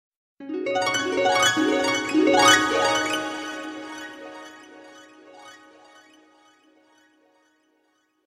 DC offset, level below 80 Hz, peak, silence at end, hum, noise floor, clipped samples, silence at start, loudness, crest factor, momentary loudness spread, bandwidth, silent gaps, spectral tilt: under 0.1%; -64 dBFS; -4 dBFS; 2.75 s; none; -68 dBFS; under 0.1%; 0.4 s; -21 LUFS; 22 dB; 23 LU; 16 kHz; none; -2 dB/octave